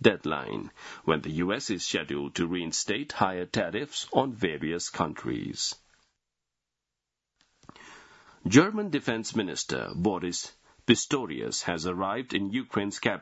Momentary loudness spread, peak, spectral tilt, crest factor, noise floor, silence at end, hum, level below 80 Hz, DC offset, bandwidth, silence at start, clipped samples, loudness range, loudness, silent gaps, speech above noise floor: 10 LU; -4 dBFS; -4 dB/octave; 26 dB; -87 dBFS; 0 s; none; -62 dBFS; under 0.1%; 8 kHz; 0 s; under 0.1%; 8 LU; -29 LUFS; none; 58 dB